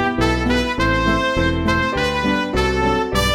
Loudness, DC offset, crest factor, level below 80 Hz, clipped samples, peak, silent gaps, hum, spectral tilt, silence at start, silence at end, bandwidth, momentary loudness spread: -18 LUFS; under 0.1%; 16 dB; -28 dBFS; under 0.1%; -2 dBFS; none; none; -5 dB/octave; 0 s; 0 s; 16.5 kHz; 2 LU